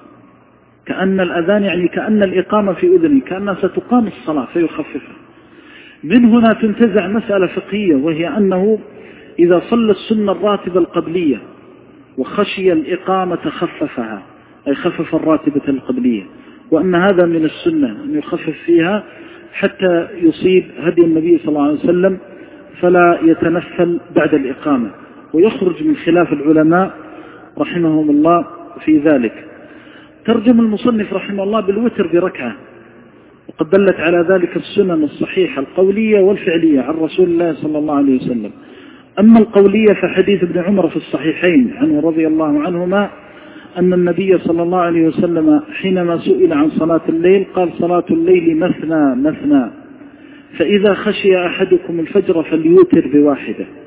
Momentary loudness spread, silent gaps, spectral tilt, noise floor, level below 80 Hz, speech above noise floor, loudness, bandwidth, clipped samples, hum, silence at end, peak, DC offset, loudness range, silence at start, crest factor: 10 LU; none; -11 dB/octave; -48 dBFS; -50 dBFS; 35 dB; -14 LUFS; 4 kHz; under 0.1%; none; 0 s; 0 dBFS; under 0.1%; 4 LU; 0.85 s; 14 dB